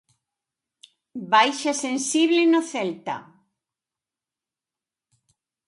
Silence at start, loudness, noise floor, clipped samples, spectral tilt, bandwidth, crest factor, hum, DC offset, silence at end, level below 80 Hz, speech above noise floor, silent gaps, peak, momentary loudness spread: 1.15 s; -21 LUFS; -90 dBFS; under 0.1%; -2.5 dB/octave; 11.5 kHz; 22 dB; none; under 0.1%; 2.45 s; -80 dBFS; 68 dB; none; -4 dBFS; 16 LU